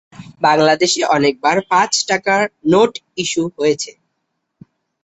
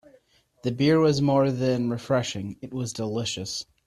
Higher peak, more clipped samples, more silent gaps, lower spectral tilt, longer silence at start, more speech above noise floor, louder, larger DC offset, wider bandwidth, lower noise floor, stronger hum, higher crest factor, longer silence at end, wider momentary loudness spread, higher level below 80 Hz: first, -2 dBFS vs -10 dBFS; neither; neither; second, -3.5 dB/octave vs -6 dB/octave; second, 0.2 s vs 0.65 s; first, 57 dB vs 36 dB; first, -15 LUFS vs -25 LUFS; neither; second, 8.2 kHz vs 13.5 kHz; first, -72 dBFS vs -60 dBFS; neither; about the same, 16 dB vs 16 dB; first, 1.15 s vs 0.25 s; second, 7 LU vs 12 LU; about the same, -58 dBFS vs -60 dBFS